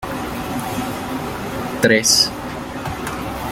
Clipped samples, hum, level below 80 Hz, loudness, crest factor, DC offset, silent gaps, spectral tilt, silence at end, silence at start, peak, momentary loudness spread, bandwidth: under 0.1%; none; -40 dBFS; -19 LUFS; 20 dB; under 0.1%; none; -2.5 dB/octave; 0 s; 0 s; 0 dBFS; 14 LU; 16.5 kHz